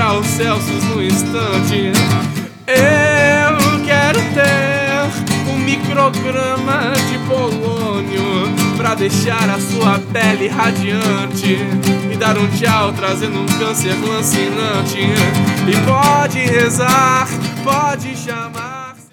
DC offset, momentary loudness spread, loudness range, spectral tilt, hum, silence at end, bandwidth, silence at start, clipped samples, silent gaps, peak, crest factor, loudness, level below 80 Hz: under 0.1%; 7 LU; 3 LU; -4.5 dB/octave; none; 0.1 s; 19.5 kHz; 0 s; under 0.1%; none; 0 dBFS; 14 dB; -14 LUFS; -52 dBFS